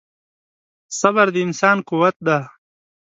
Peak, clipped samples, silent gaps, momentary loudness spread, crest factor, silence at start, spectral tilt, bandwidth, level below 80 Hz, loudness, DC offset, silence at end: 0 dBFS; under 0.1%; 2.16-2.20 s; 6 LU; 20 dB; 0.9 s; -5 dB/octave; 8 kHz; -68 dBFS; -17 LUFS; under 0.1%; 0.55 s